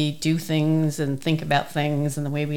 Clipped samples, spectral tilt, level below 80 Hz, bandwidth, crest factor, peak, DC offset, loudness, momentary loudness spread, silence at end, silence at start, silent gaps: under 0.1%; -6 dB/octave; -56 dBFS; 17 kHz; 16 dB; -8 dBFS; 0.7%; -23 LUFS; 4 LU; 0 s; 0 s; none